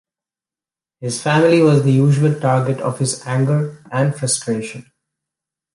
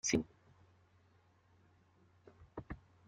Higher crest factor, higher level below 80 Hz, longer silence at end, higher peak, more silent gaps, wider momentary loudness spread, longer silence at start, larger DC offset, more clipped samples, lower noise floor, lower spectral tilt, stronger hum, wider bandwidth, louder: second, 16 dB vs 26 dB; about the same, -60 dBFS vs -64 dBFS; first, 0.95 s vs 0.3 s; first, -2 dBFS vs -20 dBFS; neither; second, 12 LU vs 27 LU; first, 1 s vs 0.05 s; neither; neither; first, under -90 dBFS vs -70 dBFS; first, -6 dB/octave vs -3.5 dB/octave; neither; first, 11.5 kHz vs 8.8 kHz; first, -17 LUFS vs -43 LUFS